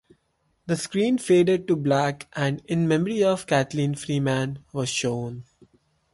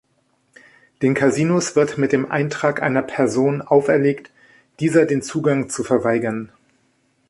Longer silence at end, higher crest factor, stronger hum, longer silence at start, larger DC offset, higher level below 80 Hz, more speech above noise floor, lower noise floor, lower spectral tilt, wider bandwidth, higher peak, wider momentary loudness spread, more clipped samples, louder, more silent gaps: second, 0.7 s vs 0.85 s; about the same, 16 dB vs 16 dB; neither; second, 0.65 s vs 1 s; neither; about the same, -60 dBFS vs -60 dBFS; about the same, 47 dB vs 46 dB; first, -70 dBFS vs -64 dBFS; about the same, -5.5 dB/octave vs -6 dB/octave; about the same, 11.5 kHz vs 11.5 kHz; second, -10 dBFS vs -2 dBFS; first, 10 LU vs 6 LU; neither; second, -24 LUFS vs -19 LUFS; neither